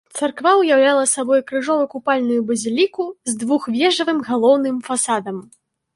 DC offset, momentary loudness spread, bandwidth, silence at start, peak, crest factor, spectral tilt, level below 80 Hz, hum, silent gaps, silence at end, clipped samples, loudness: under 0.1%; 10 LU; 11.5 kHz; 0.15 s; -2 dBFS; 16 dB; -2.5 dB/octave; -68 dBFS; none; none; 0.55 s; under 0.1%; -18 LUFS